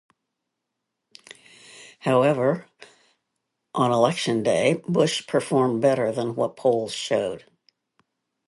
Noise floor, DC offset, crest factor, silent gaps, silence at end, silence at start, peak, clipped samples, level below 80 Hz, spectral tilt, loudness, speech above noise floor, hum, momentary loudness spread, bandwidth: -81 dBFS; under 0.1%; 20 dB; none; 1.1 s; 1.75 s; -4 dBFS; under 0.1%; -68 dBFS; -5.5 dB/octave; -23 LUFS; 60 dB; none; 11 LU; 11.5 kHz